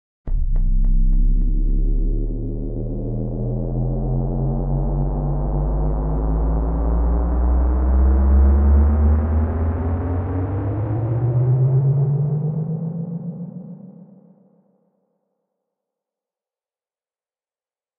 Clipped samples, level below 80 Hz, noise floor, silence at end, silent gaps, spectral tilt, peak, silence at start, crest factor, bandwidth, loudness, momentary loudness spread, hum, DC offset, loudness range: under 0.1%; -20 dBFS; under -90 dBFS; 3.95 s; none; -13 dB/octave; -6 dBFS; 0.25 s; 12 dB; 2.3 kHz; -21 LUFS; 11 LU; none; under 0.1%; 8 LU